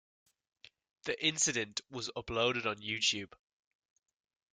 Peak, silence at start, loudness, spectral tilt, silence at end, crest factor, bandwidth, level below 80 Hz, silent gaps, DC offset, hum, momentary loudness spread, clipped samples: -16 dBFS; 1.05 s; -33 LUFS; -1.5 dB/octave; 1.25 s; 22 dB; 10.5 kHz; -66 dBFS; none; under 0.1%; none; 11 LU; under 0.1%